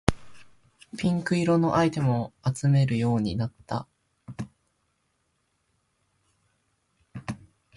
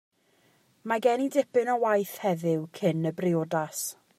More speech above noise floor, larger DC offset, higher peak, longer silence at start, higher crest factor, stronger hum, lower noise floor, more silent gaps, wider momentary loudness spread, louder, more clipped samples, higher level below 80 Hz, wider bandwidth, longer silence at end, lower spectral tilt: first, 49 dB vs 39 dB; neither; first, -2 dBFS vs -10 dBFS; second, 0.1 s vs 0.85 s; first, 26 dB vs 18 dB; neither; first, -73 dBFS vs -66 dBFS; neither; first, 18 LU vs 6 LU; about the same, -26 LUFS vs -27 LUFS; neither; first, -50 dBFS vs -78 dBFS; second, 11.5 kHz vs 16 kHz; first, 0.4 s vs 0.25 s; first, -7 dB/octave vs -5.5 dB/octave